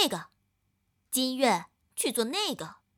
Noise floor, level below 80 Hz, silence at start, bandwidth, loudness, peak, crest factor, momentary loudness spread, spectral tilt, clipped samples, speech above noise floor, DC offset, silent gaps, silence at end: -75 dBFS; -76 dBFS; 0 s; 20 kHz; -29 LUFS; -10 dBFS; 20 dB; 13 LU; -2 dB/octave; under 0.1%; 46 dB; under 0.1%; none; 0.25 s